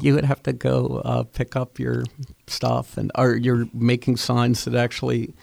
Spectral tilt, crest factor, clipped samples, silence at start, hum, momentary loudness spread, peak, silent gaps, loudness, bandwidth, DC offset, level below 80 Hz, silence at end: -6.5 dB/octave; 16 dB; under 0.1%; 0 s; none; 7 LU; -6 dBFS; none; -22 LUFS; 15 kHz; under 0.1%; -46 dBFS; 0.1 s